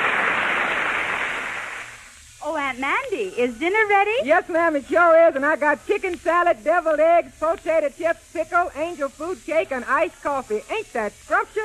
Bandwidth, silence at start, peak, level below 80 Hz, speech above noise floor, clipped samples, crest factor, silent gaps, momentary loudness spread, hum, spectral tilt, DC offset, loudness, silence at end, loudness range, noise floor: 13 kHz; 0 s; -6 dBFS; -54 dBFS; 23 dB; under 0.1%; 16 dB; none; 10 LU; none; -3.5 dB/octave; under 0.1%; -21 LUFS; 0 s; 6 LU; -44 dBFS